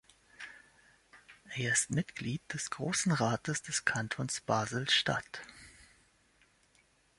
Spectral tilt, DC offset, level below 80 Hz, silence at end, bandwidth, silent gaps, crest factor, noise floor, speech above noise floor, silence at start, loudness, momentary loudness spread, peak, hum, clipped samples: -3 dB/octave; under 0.1%; -68 dBFS; 1.35 s; 11.5 kHz; none; 24 dB; -69 dBFS; 35 dB; 0.4 s; -33 LUFS; 20 LU; -12 dBFS; none; under 0.1%